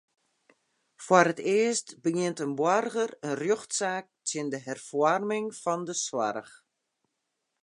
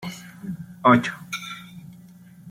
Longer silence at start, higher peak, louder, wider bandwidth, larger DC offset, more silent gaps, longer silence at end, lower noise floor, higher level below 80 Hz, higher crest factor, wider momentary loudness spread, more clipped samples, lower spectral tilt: first, 1 s vs 0 s; about the same, -4 dBFS vs -2 dBFS; second, -28 LUFS vs -21 LUFS; second, 11.5 kHz vs 16 kHz; neither; neither; first, 1.15 s vs 0 s; first, -82 dBFS vs -47 dBFS; second, -82 dBFS vs -64 dBFS; about the same, 24 dB vs 22 dB; second, 10 LU vs 22 LU; neither; second, -4 dB/octave vs -5.5 dB/octave